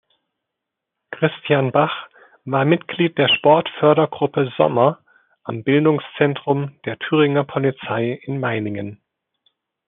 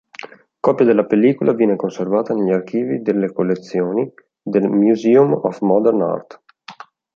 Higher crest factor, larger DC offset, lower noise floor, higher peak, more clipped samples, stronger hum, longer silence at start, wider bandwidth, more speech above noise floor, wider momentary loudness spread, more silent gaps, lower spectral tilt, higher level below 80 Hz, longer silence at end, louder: about the same, 18 dB vs 16 dB; neither; first, -82 dBFS vs -40 dBFS; about the same, -2 dBFS vs -2 dBFS; neither; neither; first, 1.1 s vs 0.25 s; second, 3.9 kHz vs 7.2 kHz; first, 64 dB vs 24 dB; first, 13 LU vs 9 LU; neither; second, -4.5 dB/octave vs -8.5 dB/octave; about the same, -68 dBFS vs -66 dBFS; first, 0.95 s vs 0.45 s; about the same, -19 LUFS vs -17 LUFS